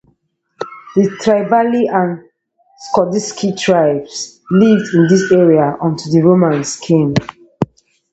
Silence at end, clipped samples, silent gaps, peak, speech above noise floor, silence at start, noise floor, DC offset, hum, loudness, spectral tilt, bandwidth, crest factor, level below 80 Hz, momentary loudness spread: 0.45 s; under 0.1%; none; 0 dBFS; 49 dB; 0.6 s; -61 dBFS; under 0.1%; none; -14 LUFS; -6 dB/octave; 8.2 kHz; 14 dB; -52 dBFS; 13 LU